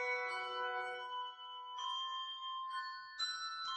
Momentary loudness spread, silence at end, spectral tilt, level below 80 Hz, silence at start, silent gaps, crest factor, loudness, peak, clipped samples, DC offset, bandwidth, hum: 7 LU; 0 s; 1 dB/octave; -88 dBFS; 0 s; none; 14 dB; -42 LUFS; -30 dBFS; under 0.1%; under 0.1%; 9.8 kHz; none